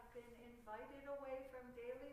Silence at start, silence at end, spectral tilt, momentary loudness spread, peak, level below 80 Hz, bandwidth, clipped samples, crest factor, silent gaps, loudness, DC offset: 0 s; 0 s; -5.5 dB/octave; 9 LU; -38 dBFS; -72 dBFS; 15.5 kHz; under 0.1%; 14 dB; none; -54 LUFS; under 0.1%